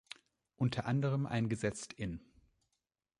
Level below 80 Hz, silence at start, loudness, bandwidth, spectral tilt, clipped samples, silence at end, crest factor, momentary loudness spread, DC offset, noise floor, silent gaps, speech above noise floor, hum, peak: -62 dBFS; 0.6 s; -37 LUFS; 11 kHz; -6.5 dB/octave; under 0.1%; 1 s; 18 dB; 16 LU; under 0.1%; -87 dBFS; none; 52 dB; none; -20 dBFS